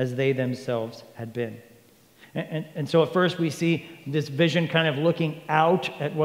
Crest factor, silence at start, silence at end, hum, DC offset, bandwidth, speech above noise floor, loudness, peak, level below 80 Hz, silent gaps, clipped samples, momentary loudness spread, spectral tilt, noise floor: 20 dB; 0 s; 0 s; none; under 0.1%; 16 kHz; 31 dB; -25 LUFS; -4 dBFS; -72 dBFS; none; under 0.1%; 13 LU; -6.5 dB/octave; -56 dBFS